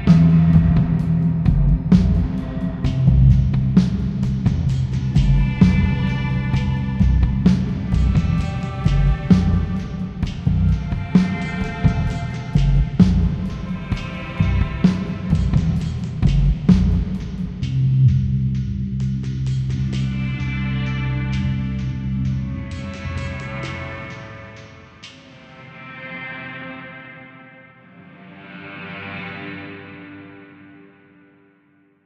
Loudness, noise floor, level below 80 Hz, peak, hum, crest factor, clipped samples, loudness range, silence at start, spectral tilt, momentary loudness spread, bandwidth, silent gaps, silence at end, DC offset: -20 LUFS; -57 dBFS; -26 dBFS; 0 dBFS; none; 18 dB; under 0.1%; 17 LU; 0 s; -8.5 dB/octave; 18 LU; 8 kHz; none; 1.4 s; under 0.1%